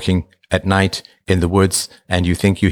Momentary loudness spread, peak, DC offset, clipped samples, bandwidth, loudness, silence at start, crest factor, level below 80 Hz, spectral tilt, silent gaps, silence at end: 7 LU; -2 dBFS; under 0.1%; under 0.1%; 19.5 kHz; -18 LUFS; 0 s; 16 dB; -36 dBFS; -5 dB/octave; none; 0 s